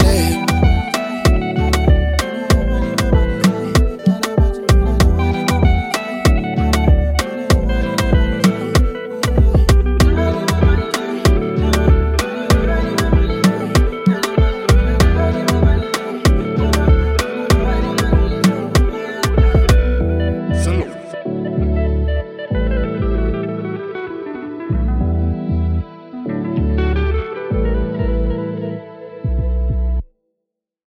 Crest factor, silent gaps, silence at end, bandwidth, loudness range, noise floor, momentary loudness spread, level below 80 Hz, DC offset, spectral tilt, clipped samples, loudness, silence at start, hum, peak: 14 dB; none; 0.85 s; 16 kHz; 5 LU; -79 dBFS; 8 LU; -18 dBFS; under 0.1%; -6 dB/octave; under 0.1%; -17 LUFS; 0 s; none; 0 dBFS